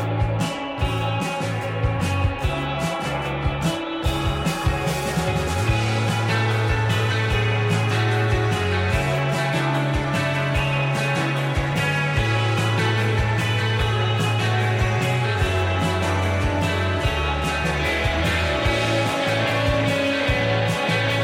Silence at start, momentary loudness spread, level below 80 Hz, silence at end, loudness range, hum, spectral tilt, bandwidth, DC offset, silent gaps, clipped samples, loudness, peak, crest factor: 0 s; 4 LU; -34 dBFS; 0 s; 3 LU; none; -5.5 dB/octave; 16 kHz; under 0.1%; none; under 0.1%; -22 LUFS; -8 dBFS; 12 dB